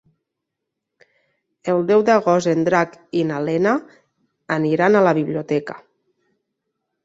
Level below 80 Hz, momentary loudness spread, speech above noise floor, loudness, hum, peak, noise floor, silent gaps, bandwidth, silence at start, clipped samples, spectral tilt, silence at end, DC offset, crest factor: -64 dBFS; 9 LU; 63 dB; -18 LUFS; none; -2 dBFS; -81 dBFS; none; 8 kHz; 1.65 s; under 0.1%; -6.5 dB/octave; 1.25 s; under 0.1%; 18 dB